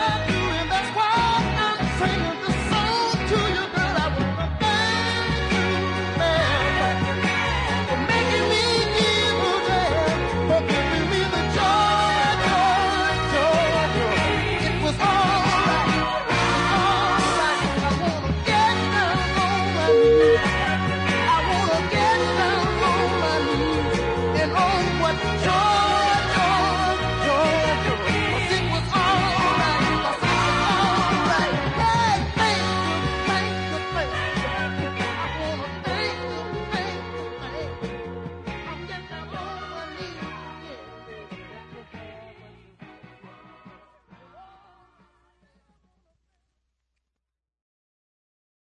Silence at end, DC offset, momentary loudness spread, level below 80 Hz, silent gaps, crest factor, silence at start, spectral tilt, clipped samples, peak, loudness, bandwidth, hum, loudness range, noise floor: 4.25 s; under 0.1%; 14 LU; -38 dBFS; none; 14 dB; 0 s; -4.5 dB/octave; under 0.1%; -8 dBFS; -21 LUFS; 11 kHz; none; 12 LU; -85 dBFS